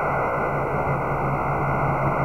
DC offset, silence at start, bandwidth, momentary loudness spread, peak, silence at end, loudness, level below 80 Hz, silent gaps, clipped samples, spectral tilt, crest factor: under 0.1%; 0 s; 7.8 kHz; 2 LU; -12 dBFS; 0 s; -23 LUFS; -38 dBFS; none; under 0.1%; -9 dB/octave; 12 dB